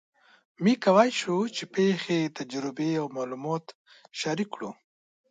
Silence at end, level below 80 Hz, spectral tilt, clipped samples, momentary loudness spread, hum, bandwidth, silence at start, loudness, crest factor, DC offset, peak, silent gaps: 0.55 s; -76 dBFS; -5.5 dB/octave; under 0.1%; 13 LU; none; 9.4 kHz; 0.6 s; -27 LUFS; 22 dB; under 0.1%; -6 dBFS; 3.75-3.85 s